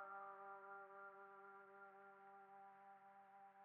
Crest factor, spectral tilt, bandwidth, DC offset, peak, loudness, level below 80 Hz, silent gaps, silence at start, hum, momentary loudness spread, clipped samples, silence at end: 16 dB; 2 dB/octave; 3.6 kHz; under 0.1%; -44 dBFS; -61 LUFS; under -90 dBFS; none; 0 s; none; 9 LU; under 0.1%; 0 s